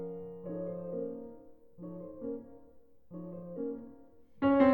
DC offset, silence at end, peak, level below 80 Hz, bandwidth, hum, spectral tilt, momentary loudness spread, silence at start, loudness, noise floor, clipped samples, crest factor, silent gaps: 0.1%; 0 s; -12 dBFS; -66 dBFS; 4.6 kHz; none; -10 dB/octave; 18 LU; 0 s; -37 LUFS; -61 dBFS; under 0.1%; 22 dB; none